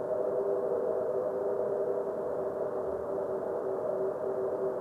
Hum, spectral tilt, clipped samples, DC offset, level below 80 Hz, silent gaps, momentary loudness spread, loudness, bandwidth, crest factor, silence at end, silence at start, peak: none; -8.5 dB/octave; under 0.1%; under 0.1%; -68 dBFS; none; 3 LU; -33 LUFS; 10.5 kHz; 14 dB; 0 s; 0 s; -18 dBFS